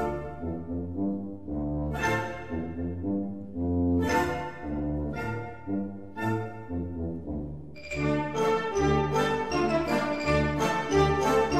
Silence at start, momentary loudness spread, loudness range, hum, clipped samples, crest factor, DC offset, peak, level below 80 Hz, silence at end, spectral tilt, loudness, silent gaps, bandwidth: 0 s; 11 LU; 7 LU; none; under 0.1%; 18 dB; 0.5%; -10 dBFS; -42 dBFS; 0 s; -6 dB/octave; -29 LUFS; none; 15 kHz